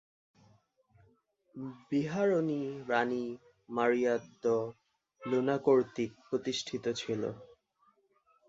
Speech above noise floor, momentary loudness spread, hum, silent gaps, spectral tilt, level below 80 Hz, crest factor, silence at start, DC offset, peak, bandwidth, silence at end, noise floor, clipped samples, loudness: 39 dB; 16 LU; none; none; -5.5 dB/octave; -74 dBFS; 20 dB; 1.55 s; under 0.1%; -14 dBFS; 7.8 kHz; 1.05 s; -71 dBFS; under 0.1%; -33 LUFS